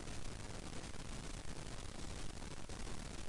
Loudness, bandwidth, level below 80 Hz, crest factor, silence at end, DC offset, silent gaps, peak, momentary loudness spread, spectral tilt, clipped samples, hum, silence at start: -50 LUFS; 11.5 kHz; -52 dBFS; 12 dB; 0 s; under 0.1%; none; -32 dBFS; 1 LU; -4 dB/octave; under 0.1%; none; 0 s